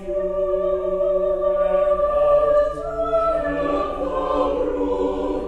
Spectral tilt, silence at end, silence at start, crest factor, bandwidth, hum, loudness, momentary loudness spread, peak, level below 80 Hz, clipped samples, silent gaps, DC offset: -7.5 dB/octave; 0 s; 0 s; 12 dB; 8 kHz; none; -21 LUFS; 6 LU; -8 dBFS; -38 dBFS; under 0.1%; none; under 0.1%